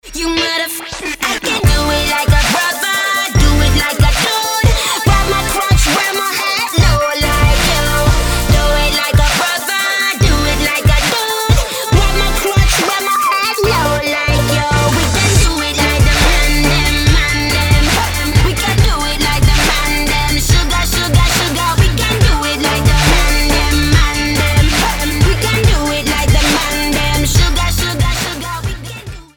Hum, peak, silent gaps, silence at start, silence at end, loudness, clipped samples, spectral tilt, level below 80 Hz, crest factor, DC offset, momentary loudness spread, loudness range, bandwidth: none; -2 dBFS; none; 0.05 s; 0.15 s; -13 LUFS; under 0.1%; -3.5 dB/octave; -16 dBFS; 10 dB; under 0.1%; 3 LU; 1 LU; over 20 kHz